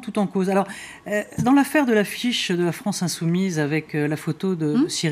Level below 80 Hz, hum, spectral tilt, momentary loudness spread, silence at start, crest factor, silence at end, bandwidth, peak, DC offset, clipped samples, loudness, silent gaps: -60 dBFS; none; -5 dB/octave; 7 LU; 0 s; 14 dB; 0 s; 15.5 kHz; -8 dBFS; under 0.1%; under 0.1%; -22 LUFS; none